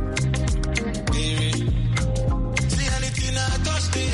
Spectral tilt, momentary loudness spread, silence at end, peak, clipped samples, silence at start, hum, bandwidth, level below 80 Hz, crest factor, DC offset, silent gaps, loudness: -4.5 dB/octave; 2 LU; 0 s; -8 dBFS; under 0.1%; 0 s; none; 11.5 kHz; -28 dBFS; 14 dB; under 0.1%; none; -23 LUFS